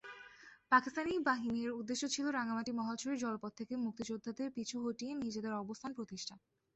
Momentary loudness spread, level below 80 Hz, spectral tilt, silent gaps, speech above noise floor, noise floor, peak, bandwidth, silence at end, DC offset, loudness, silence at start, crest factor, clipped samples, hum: 12 LU; -74 dBFS; -3.5 dB/octave; none; 21 dB; -59 dBFS; -16 dBFS; 8.2 kHz; 0.4 s; under 0.1%; -39 LUFS; 0.05 s; 22 dB; under 0.1%; none